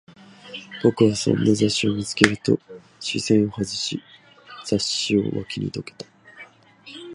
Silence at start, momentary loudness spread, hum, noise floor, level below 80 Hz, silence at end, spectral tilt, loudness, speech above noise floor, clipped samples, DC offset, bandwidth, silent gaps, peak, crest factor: 0.45 s; 19 LU; none; -47 dBFS; -54 dBFS; 0 s; -4.5 dB/octave; -22 LUFS; 26 dB; under 0.1%; under 0.1%; 11.5 kHz; none; 0 dBFS; 24 dB